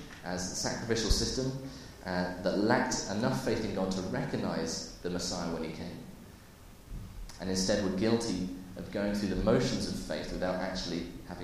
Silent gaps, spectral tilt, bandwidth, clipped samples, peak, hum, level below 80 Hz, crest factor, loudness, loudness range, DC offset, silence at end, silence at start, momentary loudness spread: none; -4.5 dB/octave; 15.5 kHz; under 0.1%; -10 dBFS; none; -44 dBFS; 22 dB; -33 LUFS; 5 LU; under 0.1%; 0 s; 0 s; 15 LU